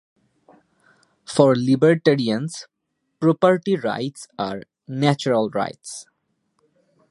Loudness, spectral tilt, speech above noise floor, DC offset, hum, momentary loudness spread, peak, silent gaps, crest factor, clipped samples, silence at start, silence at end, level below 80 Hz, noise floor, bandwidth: -20 LUFS; -6 dB/octave; 52 dB; under 0.1%; none; 17 LU; 0 dBFS; none; 22 dB; under 0.1%; 1.3 s; 1.1 s; -66 dBFS; -71 dBFS; 11.5 kHz